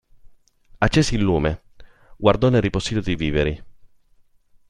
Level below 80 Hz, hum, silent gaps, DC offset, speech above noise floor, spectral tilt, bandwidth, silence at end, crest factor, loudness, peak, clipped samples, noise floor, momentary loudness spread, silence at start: -36 dBFS; none; none; under 0.1%; 37 dB; -6 dB/octave; 11 kHz; 0.85 s; 20 dB; -21 LUFS; -2 dBFS; under 0.1%; -56 dBFS; 8 LU; 0.25 s